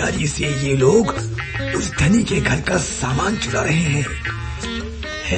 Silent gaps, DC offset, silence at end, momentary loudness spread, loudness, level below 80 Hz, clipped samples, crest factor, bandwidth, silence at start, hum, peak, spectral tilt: none; under 0.1%; 0 s; 11 LU; -19 LUFS; -32 dBFS; under 0.1%; 16 dB; 8.8 kHz; 0 s; none; -2 dBFS; -5 dB/octave